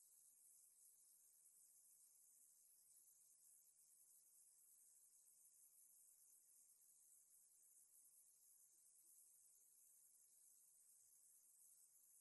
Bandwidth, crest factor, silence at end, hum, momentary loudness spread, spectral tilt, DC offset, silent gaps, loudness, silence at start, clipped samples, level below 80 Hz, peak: 12 kHz; 20 dB; 0 s; none; 1 LU; 2 dB/octave; under 0.1%; none; -70 LUFS; 0 s; under 0.1%; under -90 dBFS; -54 dBFS